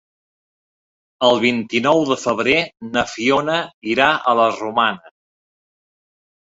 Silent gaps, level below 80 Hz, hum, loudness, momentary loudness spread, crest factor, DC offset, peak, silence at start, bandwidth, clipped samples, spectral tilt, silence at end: 3.74-3.82 s; -56 dBFS; none; -17 LUFS; 7 LU; 18 dB; under 0.1%; -2 dBFS; 1.2 s; 8 kHz; under 0.1%; -4 dB/octave; 1.45 s